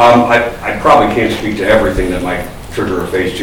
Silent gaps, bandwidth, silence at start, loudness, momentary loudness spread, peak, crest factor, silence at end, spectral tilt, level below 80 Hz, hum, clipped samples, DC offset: none; 19.5 kHz; 0 s; -12 LUFS; 10 LU; 0 dBFS; 12 dB; 0 s; -5.5 dB/octave; -28 dBFS; none; under 0.1%; 0.5%